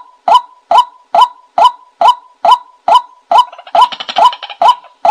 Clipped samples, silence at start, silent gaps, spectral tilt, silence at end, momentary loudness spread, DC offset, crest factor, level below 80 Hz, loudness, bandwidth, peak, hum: under 0.1%; 0.25 s; none; -1 dB/octave; 0 s; 2 LU; under 0.1%; 10 dB; -62 dBFS; -11 LUFS; 13.5 kHz; 0 dBFS; none